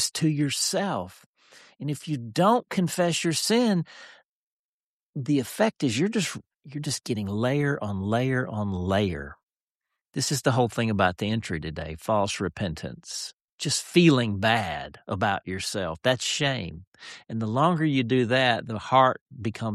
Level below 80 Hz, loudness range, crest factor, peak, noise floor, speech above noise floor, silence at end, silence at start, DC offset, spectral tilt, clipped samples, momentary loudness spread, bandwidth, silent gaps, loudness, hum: -56 dBFS; 3 LU; 20 dB; -8 dBFS; under -90 dBFS; over 65 dB; 0 s; 0 s; under 0.1%; -4.5 dB/octave; under 0.1%; 13 LU; 14 kHz; 1.26-1.34 s, 4.25-5.13 s, 6.56-6.60 s, 9.43-9.47 s, 9.61-9.80 s, 13.33-13.58 s, 16.87-16.92 s, 19.21-19.26 s; -25 LUFS; none